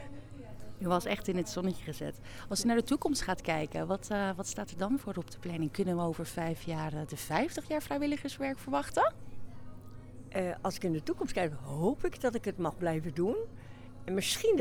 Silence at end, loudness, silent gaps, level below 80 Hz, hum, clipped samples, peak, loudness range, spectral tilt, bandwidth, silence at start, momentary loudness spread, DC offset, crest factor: 0 s; -34 LUFS; none; -52 dBFS; none; under 0.1%; -14 dBFS; 2 LU; -5 dB/octave; 19.5 kHz; 0 s; 18 LU; under 0.1%; 20 dB